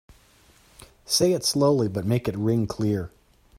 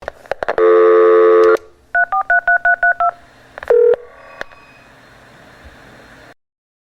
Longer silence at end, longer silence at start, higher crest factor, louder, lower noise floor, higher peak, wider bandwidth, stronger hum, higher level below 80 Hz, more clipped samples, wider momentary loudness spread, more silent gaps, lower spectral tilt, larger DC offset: second, 0.5 s vs 3 s; first, 1.1 s vs 0.3 s; first, 18 dB vs 12 dB; second, -23 LUFS vs -13 LUFS; first, -57 dBFS vs -44 dBFS; second, -8 dBFS vs -2 dBFS; first, 16 kHz vs 6.4 kHz; neither; about the same, -54 dBFS vs -50 dBFS; neither; second, 6 LU vs 23 LU; neither; about the same, -5 dB/octave vs -5.5 dB/octave; neither